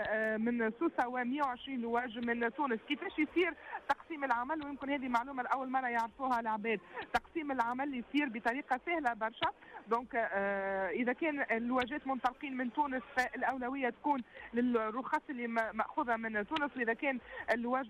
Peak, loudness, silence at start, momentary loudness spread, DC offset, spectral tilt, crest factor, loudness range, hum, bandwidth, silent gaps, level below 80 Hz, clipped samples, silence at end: -22 dBFS; -36 LUFS; 0 s; 4 LU; under 0.1%; -5.5 dB/octave; 14 dB; 1 LU; none; 13.5 kHz; none; -68 dBFS; under 0.1%; 0 s